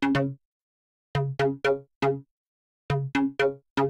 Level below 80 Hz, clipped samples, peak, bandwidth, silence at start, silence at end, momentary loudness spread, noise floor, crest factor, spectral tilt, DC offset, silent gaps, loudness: -56 dBFS; under 0.1%; -12 dBFS; 10.5 kHz; 0 s; 0 s; 8 LU; under -90 dBFS; 16 dB; -7 dB/octave; under 0.1%; 0.45-1.14 s, 1.95-2.01 s, 2.31-2.89 s, 3.70-3.76 s; -28 LUFS